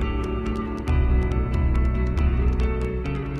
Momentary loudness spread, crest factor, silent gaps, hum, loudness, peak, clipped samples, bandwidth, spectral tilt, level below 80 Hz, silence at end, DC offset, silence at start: 5 LU; 12 dB; none; none; -24 LUFS; -10 dBFS; under 0.1%; 6.2 kHz; -8.5 dB/octave; -24 dBFS; 0 s; under 0.1%; 0 s